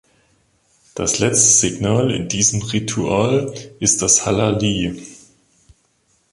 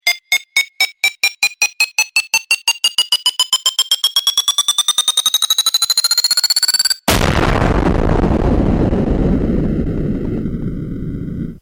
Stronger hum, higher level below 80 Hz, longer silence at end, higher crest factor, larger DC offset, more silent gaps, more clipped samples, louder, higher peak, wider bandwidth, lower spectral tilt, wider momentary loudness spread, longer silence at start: neither; second, -44 dBFS vs -24 dBFS; first, 1.2 s vs 0.05 s; first, 20 dB vs 14 dB; neither; neither; neither; about the same, -16 LUFS vs -14 LUFS; about the same, 0 dBFS vs -2 dBFS; second, 11.5 kHz vs over 20 kHz; about the same, -3.5 dB/octave vs -2.5 dB/octave; about the same, 11 LU vs 9 LU; first, 0.95 s vs 0.05 s